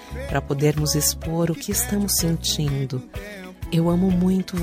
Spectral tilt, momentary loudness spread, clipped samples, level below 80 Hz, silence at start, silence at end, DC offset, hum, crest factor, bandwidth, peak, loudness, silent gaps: -4.5 dB/octave; 11 LU; under 0.1%; -36 dBFS; 0 s; 0 s; under 0.1%; none; 16 dB; 16 kHz; -6 dBFS; -22 LUFS; none